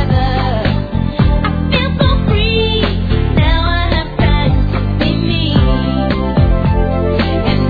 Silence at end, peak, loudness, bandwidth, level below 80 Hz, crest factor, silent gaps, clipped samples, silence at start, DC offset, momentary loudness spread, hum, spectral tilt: 0 s; -2 dBFS; -14 LUFS; 5 kHz; -18 dBFS; 12 dB; none; under 0.1%; 0 s; 0.4%; 3 LU; none; -9 dB/octave